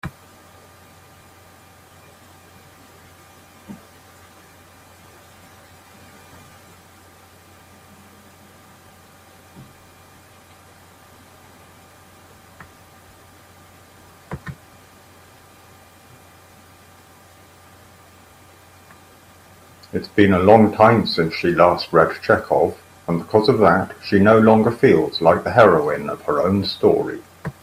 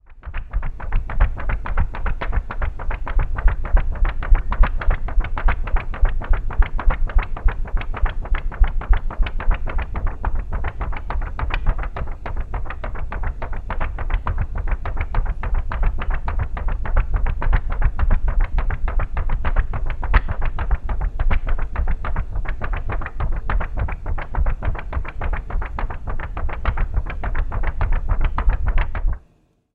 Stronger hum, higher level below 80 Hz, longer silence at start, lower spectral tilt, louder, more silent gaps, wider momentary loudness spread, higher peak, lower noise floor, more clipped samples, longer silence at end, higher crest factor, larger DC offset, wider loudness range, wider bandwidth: neither; second, -56 dBFS vs -20 dBFS; about the same, 0.05 s vs 0.1 s; second, -7 dB/octave vs -8.5 dB/octave; first, -16 LUFS vs -26 LUFS; neither; first, 22 LU vs 7 LU; about the same, 0 dBFS vs 0 dBFS; second, -48 dBFS vs -58 dBFS; neither; second, 0.1 s vs 0.55 s; about the same, 22 dB vs 18 dB; neither; first, 26 LU vs 4 LU; first, 15.5 kHz vs 4 kHz